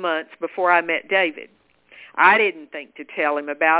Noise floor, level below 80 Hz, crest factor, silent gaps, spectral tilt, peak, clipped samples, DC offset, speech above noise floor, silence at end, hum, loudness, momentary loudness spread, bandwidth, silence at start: -48 dBFS; -70 dBFS; 20 dB; none; -6.5 dB/octave; -2 dBFS; under 0.1%; under 0.1%; 28 dB; 0 s; none; -19 LUFS; 20 LU; 4 kHz; 0 s